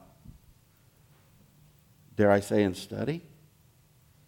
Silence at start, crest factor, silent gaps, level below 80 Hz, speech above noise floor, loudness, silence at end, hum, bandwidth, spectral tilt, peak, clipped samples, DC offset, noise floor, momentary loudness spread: 2.2 s; 24 dB; none; -62 dBFS; 36 dB; -28 LUFS; 1.1 s; none; 17.5 kHz; -6.5 dB/octave; -8 dBFS; under 0.1%; under 0.1%; -62 dBFS; 14 LU